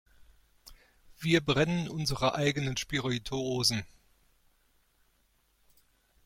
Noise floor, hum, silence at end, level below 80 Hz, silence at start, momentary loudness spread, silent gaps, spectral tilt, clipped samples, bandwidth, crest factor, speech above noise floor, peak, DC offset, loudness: -71 dBFS; none; 2.4 s; -54 dBFS; 0.2 s; 7 LU; none; -4.5 dB/octave; under 0.1%; 16.5 kHz; 22 dB; 41 dB; -12 dBFS; under 0.1%; -30 LUFS